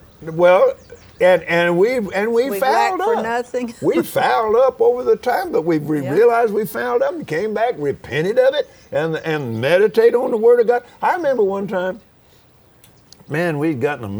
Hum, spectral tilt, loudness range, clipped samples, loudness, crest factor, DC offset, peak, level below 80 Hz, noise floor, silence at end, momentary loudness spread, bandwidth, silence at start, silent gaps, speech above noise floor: none; -6 dB/octave; 3 LU; under 0.1%; -17 LUFS; 16 dB; under 0.1%; -2 dBFS; -56 dBFS; -51 dBFS; 0 s; 9 LU; over 20 kHz; 0.2 s; none; 34 dB